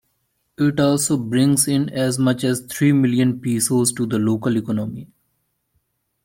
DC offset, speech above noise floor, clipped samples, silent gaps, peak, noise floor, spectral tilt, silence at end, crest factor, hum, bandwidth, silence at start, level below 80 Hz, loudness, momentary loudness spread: under 0.1%; 52 dB; under 0.1%; none; -4 dBFS; -70 dBFS; -5 dB/octave; 1.2 s; 16 dB; none; 16.5 kHz; 0.6 s; -58 dBFS; -19 LUFS; 6 LU